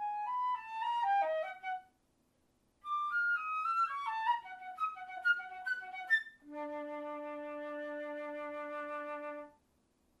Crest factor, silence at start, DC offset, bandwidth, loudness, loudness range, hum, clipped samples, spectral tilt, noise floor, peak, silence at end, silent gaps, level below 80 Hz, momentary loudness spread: 18 dB; 0 s; under 0.1%; 13 kHz; -37 LUFS; 7 LU; none; under 0.1%; -2.5 dB/octave; -75 dBFS; -20 dBFS; 0.7 s; none; -82 dBFS; 11 LU